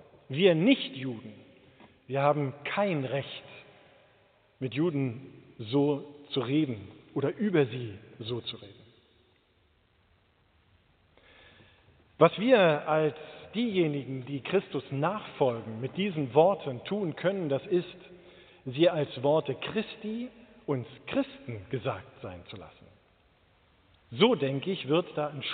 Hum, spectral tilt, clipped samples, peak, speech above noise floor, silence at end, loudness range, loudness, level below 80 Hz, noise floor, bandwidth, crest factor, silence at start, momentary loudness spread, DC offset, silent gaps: none; -5 dB/octave; under 0.1%; -6 dBFS; 39 dB; 0 s; 9 LU; -29 LUFS; -70 dBFS; -67 dBFS; 4.6 kHz; 24 dB; 0.3 s; 19 LU; under 0.1%; none